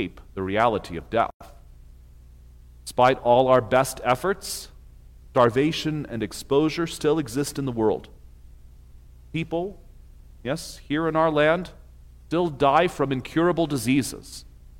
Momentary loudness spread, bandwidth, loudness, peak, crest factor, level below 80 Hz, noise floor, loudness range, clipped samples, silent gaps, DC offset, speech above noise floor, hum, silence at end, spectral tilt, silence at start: 13 LU; 16.5 kHz; -24 LUFS; -6 dBFS; 20 dB; -46 dBFS; -47 dBFS; 7 LU; under 0.1%; 1.34-1.40 s; under 0.1%; 24 dB; 60 Hz at -50 dBFS; 0 s; -5.5 dB/octave; 0 s